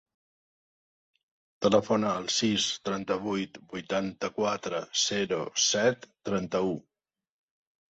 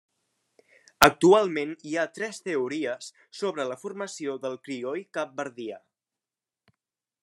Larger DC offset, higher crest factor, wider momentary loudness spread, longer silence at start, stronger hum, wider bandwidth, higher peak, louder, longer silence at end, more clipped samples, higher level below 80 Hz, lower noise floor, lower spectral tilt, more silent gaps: neither; second, 20 dB vs 28 dB; second, 9 LU vs 16 LU; first, 1.6 s vs 1 s; neither; second, 8.2 kHz vs 13 kHz; second, -10 dBFS vs 0 dBFS; about the same, -28 LUFS vs -26 LUFS; second, 1.1 s vs 1.45 s; neither; second, -66 dBFS vs -60 dBFS; about the same, under -90 dBFS vs under -90 dBFS; about the same, -3 dB/octave vs -4 dB/octave; neither